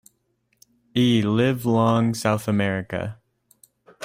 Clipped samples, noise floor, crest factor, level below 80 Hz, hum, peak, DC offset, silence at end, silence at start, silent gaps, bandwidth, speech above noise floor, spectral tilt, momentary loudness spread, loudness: under 0.1%; -70 dBFS; 16 dB; -58 dBFS; none; -6 dBFS; under 0.1%; 0 s; 0.95 s; none; 16 kHz; 49 dB; -6.5 dB/octave; 10 LU; -22 LUFS